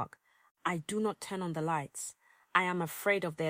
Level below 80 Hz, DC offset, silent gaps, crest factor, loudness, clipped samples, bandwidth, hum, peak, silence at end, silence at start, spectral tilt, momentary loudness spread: -76 dBFS; under 0.1%; 0.51-0.55 s; 24 dB; -34 LUFS; under 0.1%; 16.5 kHz; none; -10 dBFS; 0 s; 0 s; -4.5 dB/octave; 11 LU